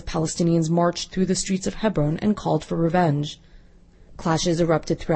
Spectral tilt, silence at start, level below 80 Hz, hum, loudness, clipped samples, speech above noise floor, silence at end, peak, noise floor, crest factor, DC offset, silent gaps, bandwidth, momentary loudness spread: -5.5 dB/octave; 0 s; -42 dBFS; none; -23 LUFS; under 0.1%; 28 dB; 0 s; -6 dBFS; -50 dBFS; 16 dB; under 0.1%; none; 8.8 kHz; 6 LU